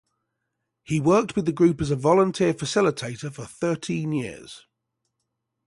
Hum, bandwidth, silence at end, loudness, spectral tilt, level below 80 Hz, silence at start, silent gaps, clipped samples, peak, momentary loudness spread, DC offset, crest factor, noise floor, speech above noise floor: none; 11.5 kHz; 1.1 s; -23 LUFS; -6 dB/octave; -56 dBFS; 0.9 s; none; under 0.1%; -6 dBFS; 15 LU; under 0.1%; 18 dB; -80 dBFS; 57 dB